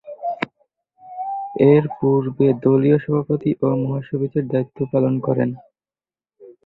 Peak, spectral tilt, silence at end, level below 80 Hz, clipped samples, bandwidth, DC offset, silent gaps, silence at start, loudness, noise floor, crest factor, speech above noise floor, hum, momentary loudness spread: -2 dBFS; -11.5 dB/octave; 0.15 s; -58 dBFS; under 0.1%; 4.9 kHz; under 0.1%; none; 0.05 s; -19 LUFS; under -90 dBFS; 18 dB; over 72 dB; none; 13 LU